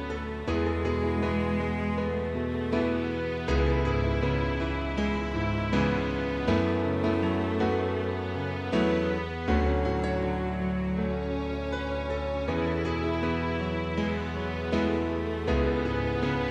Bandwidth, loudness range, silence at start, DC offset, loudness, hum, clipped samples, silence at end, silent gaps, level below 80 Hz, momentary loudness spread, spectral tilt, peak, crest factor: 8.6 kHz; 2 LU; 0 s; under 0.1%; -29 LUFS; none; under 0.1%; 0 s; none; -36 dBFS; 5 LU; -7.5 dB/octave; -12 dBFS; 16 dB